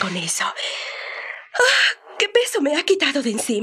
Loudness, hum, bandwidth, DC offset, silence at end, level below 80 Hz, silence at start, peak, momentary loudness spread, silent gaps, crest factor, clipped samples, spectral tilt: -19 LUFS; none; 15 kHz; under 0.1%; 0 s; -74 dBFS; 0 s; -2 dBFS; 13 LU; none; 20 dB; under 0.1%; -2 dB/octave